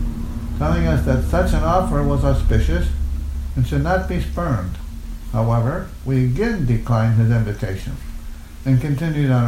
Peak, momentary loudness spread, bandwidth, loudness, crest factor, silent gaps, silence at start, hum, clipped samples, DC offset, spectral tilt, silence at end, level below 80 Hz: -4 dBFS; 11 LU; 15.5 kHz; -20 LUFS; 14 dB; none; 0 s; none; under 0.1%; under 0.1%; -8 dB/octave; 0 s; -24 dBFS